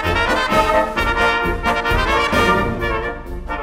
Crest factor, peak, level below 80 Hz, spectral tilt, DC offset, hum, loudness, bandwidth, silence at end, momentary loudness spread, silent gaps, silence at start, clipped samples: 16 dB; -2 dBFS; -28 dBFS; -4.5 dB/octave; under 0.1%; none; -17 LUFS; 16 kHz; 0 s; 8 LU; none; 0 s; under 0.1%